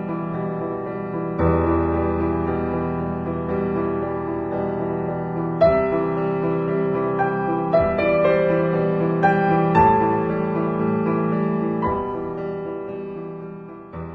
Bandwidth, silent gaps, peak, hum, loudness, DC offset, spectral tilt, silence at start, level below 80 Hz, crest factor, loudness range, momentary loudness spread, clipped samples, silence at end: 5 kHz; none; -2 dBFS; none; -21 LUFS; under 0.1%; -10.5 dB/octave; 0 s; -42 dBFS; 18 dB; 6 LU; 11 LU; under 0.1%; 0 s